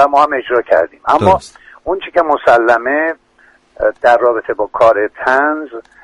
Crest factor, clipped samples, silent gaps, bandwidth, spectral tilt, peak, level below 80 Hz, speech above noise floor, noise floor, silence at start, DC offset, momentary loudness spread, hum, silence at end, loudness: 14 dB; under 0.1%; none; 11 kHz; -6 dB/octave; 0 dBFS; -46 dBFS; 37 dB; -50 dBFS; 0 s; under 0.1%; 10 LU; none; 0.25 s; -13 LUFS